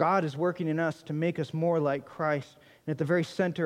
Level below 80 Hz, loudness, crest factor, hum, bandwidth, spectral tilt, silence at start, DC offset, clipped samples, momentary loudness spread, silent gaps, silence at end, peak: -74 dBFS; -30 LUFS; 18 dB; none; 11.5 kHz; -7.5 dB/octave; 0 s; under 0.1%; under 0.1%; 7 LU; none; 0 s; -12 dBFS